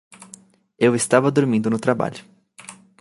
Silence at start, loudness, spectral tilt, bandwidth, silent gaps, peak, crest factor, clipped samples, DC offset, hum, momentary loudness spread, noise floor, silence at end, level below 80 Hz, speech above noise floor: 0.2 s; -19 LUFS; -5.5 dB/octave; 11.5 kHz; none; -2 dBFS; 20 dB; under 0.1%; under 0.1%; none; 24 LU; -48 dBFS; 0.3 s; -64 dBFS; 29 dB